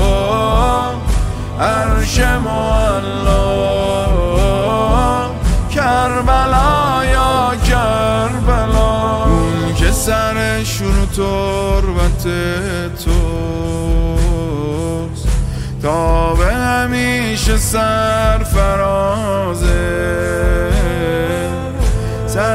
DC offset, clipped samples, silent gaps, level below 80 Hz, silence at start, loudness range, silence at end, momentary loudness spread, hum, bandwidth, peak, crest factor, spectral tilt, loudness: under 0.1%; under 0.1%; none; -18 dBFS; 0 s; 3 LU; 0 s; 5 LU; none; 16 kHz; 0 dBFS; 14 dB; -5.5 dB/octave; -15 LUFS